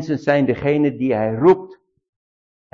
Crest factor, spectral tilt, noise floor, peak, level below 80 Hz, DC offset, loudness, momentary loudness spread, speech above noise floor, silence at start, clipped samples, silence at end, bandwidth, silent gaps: 16 dB; -8.5 dB/octave; under -90 dBFS; -4 dBFS; -52 dBFS; under 0.1%; -18 LUFS; 5 LU; over 73 dB; 0 s; under 0.1%; 1 s; 7 kHz; none